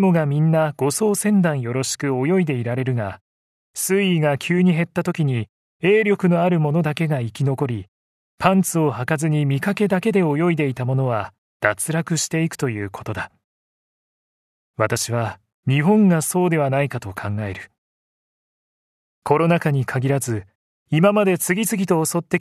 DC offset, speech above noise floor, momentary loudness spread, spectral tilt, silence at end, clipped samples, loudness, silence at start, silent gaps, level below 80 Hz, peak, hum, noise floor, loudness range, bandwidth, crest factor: under 0.1%; over 71 dB; 11 LU; -6 dB/octave; 0 s; under 0.1%; -20 LUFS; 0 s; 3.21-3.74 s, 5.49-5.80 s, 7.88-8.38 s, 11.38-11.60 s, 13.44-14.74 s, 15.54-15.63 s, 17.78-19.22 s, 20.55-20.86 s; -60 dBFS; 0 dBFS; none; under -90 dBFS; 5 LU; 14 kHz; 20 dB